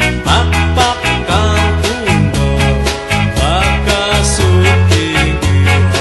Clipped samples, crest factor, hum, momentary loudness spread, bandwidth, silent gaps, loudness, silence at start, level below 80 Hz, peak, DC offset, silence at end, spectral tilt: under 0.1%; 12 dB; none; 4 LU; 12.5 kHz; none; -12 LUFS; 0 s; -20 dBFS; 0 dBFS; under 0.1%; 0 s; -4.5 dB/octave